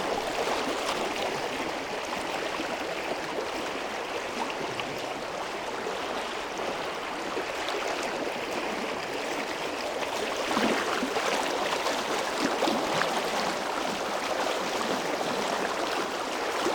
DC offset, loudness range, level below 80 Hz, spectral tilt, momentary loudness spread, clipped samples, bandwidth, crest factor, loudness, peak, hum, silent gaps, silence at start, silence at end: under 0.1%; 5 LU; -60 dBFS; -2.5 dB/octave; 6 LU; under 0.1%; 19 kHz; 22 dB; -30 LUFS; -8 dBFS; none; none; 0 s; 0 s